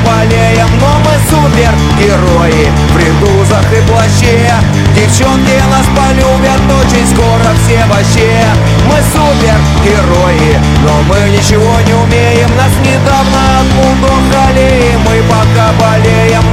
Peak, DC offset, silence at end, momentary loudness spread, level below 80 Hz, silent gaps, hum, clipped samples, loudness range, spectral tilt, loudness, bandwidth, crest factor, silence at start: 0 dBFS; under 0.1%; 0 s; 1 LU; -16 dBFS; none; none; 0.3%; 0 LU; -5.5 dB/octave; -7 LUFS; 16.5 kHz; 6 dB; 0 s